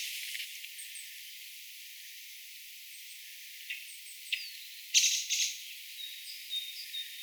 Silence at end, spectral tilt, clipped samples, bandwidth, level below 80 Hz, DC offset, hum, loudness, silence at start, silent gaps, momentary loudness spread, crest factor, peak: 0 s; 12.5 dB/octave; under 0.1%; over 20 kHz; under -90 dBFS; under 0.1%; none; -35 LUFS; 0 s; none; 17 LU; 28 dB; -10 dBFS